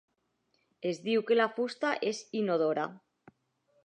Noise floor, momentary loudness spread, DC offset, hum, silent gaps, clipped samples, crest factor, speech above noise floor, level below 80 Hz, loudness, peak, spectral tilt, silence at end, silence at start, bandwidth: -77 dBFS; 9 LU; under 0.1%; none; none; under 0.1%; 20 dB; 46 dB; -86 dBFS; -31 LUFS; -12 dBFS; -5 dB/octave; 0.9 s; 0.8 s; 9.6 kHz